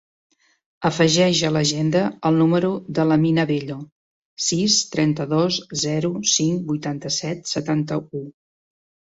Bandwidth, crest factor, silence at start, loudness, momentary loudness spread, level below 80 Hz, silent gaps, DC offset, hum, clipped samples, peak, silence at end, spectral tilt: 8 kHz; 18 dB; 0.8 s; -20 LUFS; 9 LU; -58 dBFS; 3.92-4.37 s; under 0.1%; none; under 0.1%; -4 dBFS; 0.8 s; -4.5 dB/octave